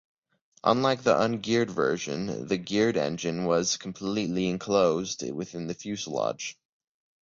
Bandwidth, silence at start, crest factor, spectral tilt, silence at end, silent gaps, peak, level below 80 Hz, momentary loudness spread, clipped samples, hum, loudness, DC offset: 7.8 kHz; 0.65 s; 20 dB; -4.5 dB/octave; 0.7 s; none; -8 dBFS; -62 dBFS; 10 LU; under 0.1%; none; -27 LUFS; under 0.1%